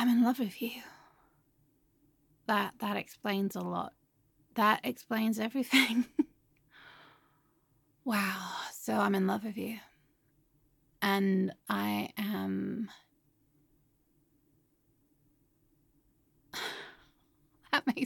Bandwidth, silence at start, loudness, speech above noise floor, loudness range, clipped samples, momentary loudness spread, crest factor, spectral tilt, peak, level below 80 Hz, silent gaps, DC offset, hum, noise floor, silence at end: 17.5 kHz; 0 s; -32 LUFS; 40 dB; 15 LU; under 0.1%; 13 LU; 24 dB; -5 dB/octave; -12 dBFS; -76 dBFS; none; under 0.1%; none; -72 dBFS; 0 s